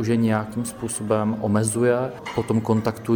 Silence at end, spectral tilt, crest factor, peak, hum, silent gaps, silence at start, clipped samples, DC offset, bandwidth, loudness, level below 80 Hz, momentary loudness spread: 0 s; -6 dB/octave; 16 dB; -6 dBFS; none; none; 0 s; under 0.1%; under 0.1%; 19 kHz; -23 LUFS; -54 dBFS; 8 LU